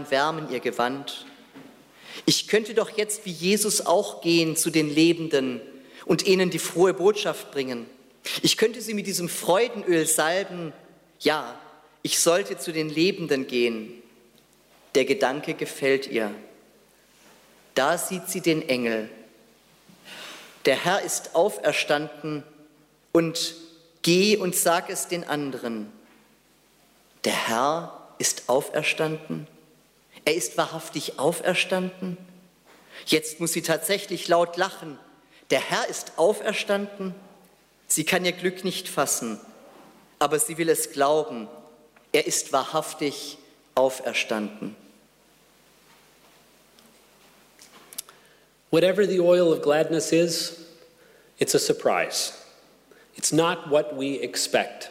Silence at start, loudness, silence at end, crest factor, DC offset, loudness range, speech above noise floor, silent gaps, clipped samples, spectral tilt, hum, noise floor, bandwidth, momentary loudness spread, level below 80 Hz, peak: 0 s; -24 LUFS; 0 s; 18 dB; under 0.1%; 5 LU; 36 dB; none; under 0.1%; -3 dB/octave; none; -60 dBFS; 16 kHz; 15 LU; -72 dBFS; -8 dBFS